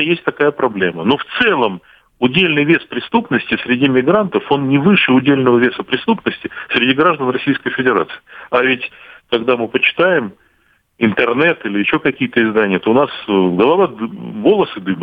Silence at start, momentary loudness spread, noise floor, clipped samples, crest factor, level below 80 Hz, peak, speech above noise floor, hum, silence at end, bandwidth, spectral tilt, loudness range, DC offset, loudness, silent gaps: 0 s; 7 LU; -58 dBFS; under 0.1%; 14 dB; -54 dBFS; -2 dBFS; 43 dB; none; 0 s; 5 kHz; -8.5 dB/octave; 3 LU; under 0.1%; -14 LUFS; none